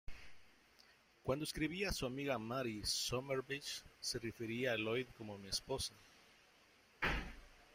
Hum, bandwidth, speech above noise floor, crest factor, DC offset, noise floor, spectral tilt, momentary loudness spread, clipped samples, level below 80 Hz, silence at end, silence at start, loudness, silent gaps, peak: none; 16 kHz; 27 dB; 20 dB; under 0.1%; -69 dBFS; -3.5 dB/octave; 10 LU; under 0.1%; -58 dBFS; 0.1 s; 0.1 s; -42 LUFS; none; -24 dBFS